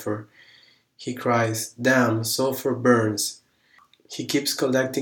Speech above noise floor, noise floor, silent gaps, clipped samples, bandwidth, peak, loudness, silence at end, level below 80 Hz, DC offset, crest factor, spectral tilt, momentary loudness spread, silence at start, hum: 36 dB; -59 dBFS; none; under 0.1%; 19.5 kHz; -4 dBFS; -23 LUFS; 0 s; -74 dBFS; under 0.1%; 20 dB; -4 dB/octave; 14 LU; 0 s; none